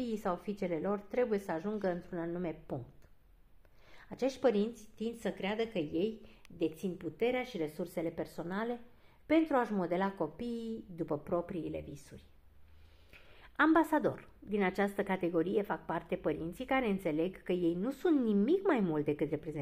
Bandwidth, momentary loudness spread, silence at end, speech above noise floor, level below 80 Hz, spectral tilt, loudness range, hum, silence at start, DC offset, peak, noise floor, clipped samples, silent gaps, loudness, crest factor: 15.5 kHz; 12 LU; 0 s; 27 dB; -62 dBFS; -7 dB/octave; 6 LU; none; 0 s; under 0.1%; -16 dBFS; -61 dBFS; under 0.1%; none; -35 LUFS; 20 dB